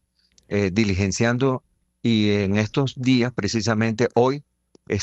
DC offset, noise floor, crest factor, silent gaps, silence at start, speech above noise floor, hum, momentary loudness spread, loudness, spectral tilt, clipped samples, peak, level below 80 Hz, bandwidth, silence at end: under 0.1%; -60 dBFS; 18 dB; none; 0.5 s; 40 dB; none; 8 LU; -22 LUFS; -5.5 dB/octave; under 0.1%; -4 dBFS; -56 dBFS; 8.4 kHz; 0 s